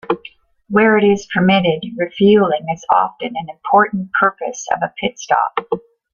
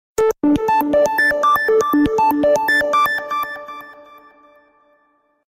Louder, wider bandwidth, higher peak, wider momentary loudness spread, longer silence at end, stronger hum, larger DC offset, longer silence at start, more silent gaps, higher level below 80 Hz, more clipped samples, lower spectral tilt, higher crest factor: about the same, -16 LUFS vs -16 LUFS; second, 7.2 kHz vs 16.5 kHz; about the same, -2 dBFS vs -4 dBFS; about the same, 12 LU vs 10 LU; second, 0.35 s vs 1.5 s; neither; neither; about the same, 0.1 s vs 0.2 s; neither; second, -54 dBFS vs -48 dBFS; neither; about the same, -5.5 dB/octave vs -4.5 dB/octave; about the same, 14 dB vs 14 dB